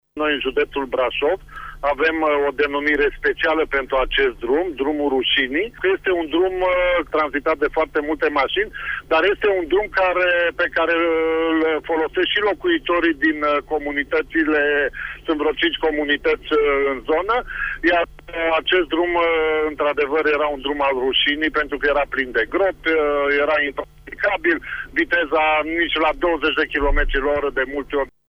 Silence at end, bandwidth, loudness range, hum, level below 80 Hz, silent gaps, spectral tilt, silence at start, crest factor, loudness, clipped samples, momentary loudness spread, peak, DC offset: 0.2 s; 6.2 kHz; 1 LU; none; -36 dBFS; none; -5.5 dB/octave; 0.15 s; 14 dB; -19 LUFS; under 0.1%; 5 LU; -6 dBFS; under 0.1%